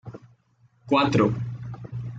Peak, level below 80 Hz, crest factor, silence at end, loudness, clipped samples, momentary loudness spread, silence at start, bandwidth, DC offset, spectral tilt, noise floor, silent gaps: -8 dBFS; -54 dBFS; 18 dB; 0 s; -24 LUFS; under 0.1%; 16 LU; 0.05 s; 7.8 kHz; under 0.1%; -7 dB/octave; -62 dBFS; none